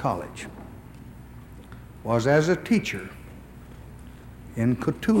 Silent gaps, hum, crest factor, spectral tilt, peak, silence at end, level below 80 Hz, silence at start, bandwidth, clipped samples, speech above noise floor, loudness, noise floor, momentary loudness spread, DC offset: none; 60 Hz at -45 dBFS; 18 dB; -6.5 dB/octave; -8 dBFS; 0 s; -48 dBFS; 0 s; 16 kHz; under 0.1%; 20 dB; -25 LUFS; -44 dBFS; 24 LU; under 0.1%